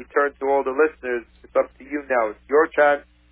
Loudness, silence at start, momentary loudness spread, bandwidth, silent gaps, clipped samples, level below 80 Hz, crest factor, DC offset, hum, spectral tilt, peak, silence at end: -22 LUFS; 0 s; 10 LU; 3.8 kHz; none; under 0.1%; -56 dBFS; 16 dB; under 0.1%; none; -8 dB/octave; -6 dBFS; 0.3 s